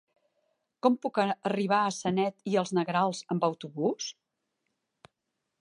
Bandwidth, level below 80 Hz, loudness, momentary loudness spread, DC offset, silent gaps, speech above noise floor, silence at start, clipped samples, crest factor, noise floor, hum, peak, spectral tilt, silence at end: 11 kHz; -76 dBFS; -29 LUFS; 4 LU; under 0.1%; none; 55 dB; 0.85 s; under 0.1%; 20 dB; -84 dBFS; none; -10 dBFS; -5.5 dB/octave; 1.5 s